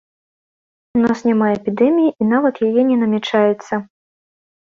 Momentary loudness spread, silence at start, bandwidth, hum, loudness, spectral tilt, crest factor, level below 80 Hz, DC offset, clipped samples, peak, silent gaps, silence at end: 7 LU; 0.95 s; 7.4 kHz; none; -16 LUFS; -7 dB/octave; 14 dB; -58 dBFS; under 0.1%; under 0.1%; -4 dBFS; none; 0.8 s